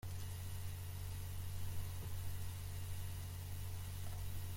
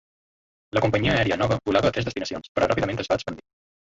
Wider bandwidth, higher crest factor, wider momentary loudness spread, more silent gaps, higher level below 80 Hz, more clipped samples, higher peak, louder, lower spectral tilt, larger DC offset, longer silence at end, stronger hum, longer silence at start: first, 16.5 kHz vs 8 kHz; about the same, 14 dB vs 18 dB; second, 1 LU vs 8 LU; second, none vs 2.49-2.55 s; second, -54 dBFS vs -46 dBFS; neither; second, -30 dBFS vs -8 dBFS; second, -47 LUFS vs -24 LUFS; second, -4.5 dB/octave vs -6 dB/octave; neither; second, 0 s vs 0.55 s; neither; second, 0.05 s vs 0.75 s